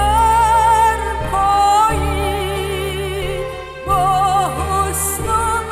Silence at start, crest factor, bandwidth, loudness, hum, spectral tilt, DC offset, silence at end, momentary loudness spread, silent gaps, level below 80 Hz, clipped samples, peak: 0 s; 12 dB; 16.5 kHz; -16 LUFS; none; -4 dB/octave; under 0.1%; 0 s; 9 LU; none; -28 dBFS; under 0.1%; -4 dBFS